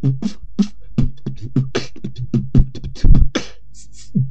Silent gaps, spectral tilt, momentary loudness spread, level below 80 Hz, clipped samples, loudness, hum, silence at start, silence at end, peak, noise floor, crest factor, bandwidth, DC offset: none; -7 dB/octave; 13 LU; -20 dBFS; 0.2%; -21 LUFS; none; 0.05 s; 0 s; 0 dBFS; -43 dBFS; 16 dB; 7.8 kHz; 5%